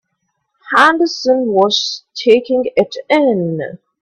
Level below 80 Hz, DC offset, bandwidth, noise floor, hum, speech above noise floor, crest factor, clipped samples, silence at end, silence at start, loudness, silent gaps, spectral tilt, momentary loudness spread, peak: -60 dBFS; under 0.1%; 11.5 kHz; -70 dBFS; none; 56 dB; 14 dB; under 0.1%; 0.25 s; 0.65 s; -14 LUFS; none; -4.5 dB/octave; 10 LU; 0 dBFS